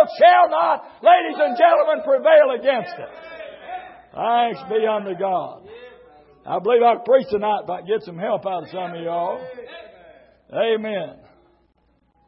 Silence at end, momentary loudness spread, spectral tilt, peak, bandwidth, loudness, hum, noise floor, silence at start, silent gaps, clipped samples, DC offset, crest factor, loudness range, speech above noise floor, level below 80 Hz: 1.15 s; 21 LU; -9 dB/octave; -2 dBFS; 5.8 kHz; -19 LUFS; none; -63 dBFS; 0 s; none; under 0.1%; under 0.1%; 18 dB; 9 LU; 44 dB; -66 dBFS